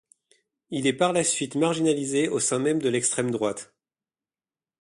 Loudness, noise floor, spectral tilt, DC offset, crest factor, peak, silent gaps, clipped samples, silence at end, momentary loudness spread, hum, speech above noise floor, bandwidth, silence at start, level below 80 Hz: -24 LUFS; under -90 dBFS; -3.5 dB/octave; under 0.1%; 18 dB; -8 dBFS; none; under 0.1%; 1.15 s; 6 LU; none; over 66 dB; 11.5 kHz; 0.7 s; -68 dBFS